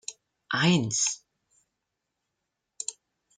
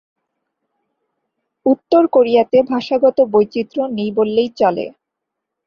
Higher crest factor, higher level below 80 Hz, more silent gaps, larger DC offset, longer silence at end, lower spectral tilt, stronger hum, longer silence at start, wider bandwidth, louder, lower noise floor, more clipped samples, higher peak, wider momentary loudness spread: first, 22 dB vs 16 dB; second, -70 dBFS vs -60 dBFS; neither; neither; second, 0.45 s vs 0.75 s; second, -3.5 dB/octave vs -7.5 dB/octave; neither; second, 0.1 s vs 1.65 s; first, 9.8 kHz vs 6.8 kHz; second, -27 LUFS vs -15 LUFS; about the same, -83 dBFS vs -80 dBFS; neither; second, -8 dBFS vs -2 dBFS; first, 15 LU vs 8 LU